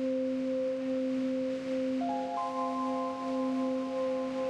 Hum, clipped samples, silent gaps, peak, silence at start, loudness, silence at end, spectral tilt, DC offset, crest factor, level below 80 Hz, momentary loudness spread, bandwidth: none; under 0.1%; none; -24 dBFS; 0 s; -33 LUFS; 0 s; -6 dB/octave; under 0.1%; 8 dB; -72 dBFS; 2 LU; 9.4 kHz